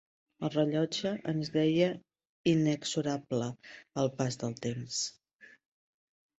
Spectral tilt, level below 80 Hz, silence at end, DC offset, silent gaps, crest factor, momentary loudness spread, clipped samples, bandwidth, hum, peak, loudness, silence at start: -5.5 dB/octave; -70 dBFS; 1.3 s; under 0.1%; 2.25-2.44 s; 18 dB; 10 LU; under 0.1%; 8.2 kHz; none; -14 dBFS; -32 LUFS; 0.4 s